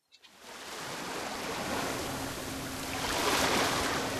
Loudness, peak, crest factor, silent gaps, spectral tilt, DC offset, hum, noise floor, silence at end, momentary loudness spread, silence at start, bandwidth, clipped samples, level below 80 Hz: -32 LUFS; -16 dBFS; 18 dB; none; -2.5 dB/octave; under 0.1%; none; -54 dBFS; 0 s; 14 LU; 0.25 s; 13.5 kHz; under 0.1%; -54 dBFS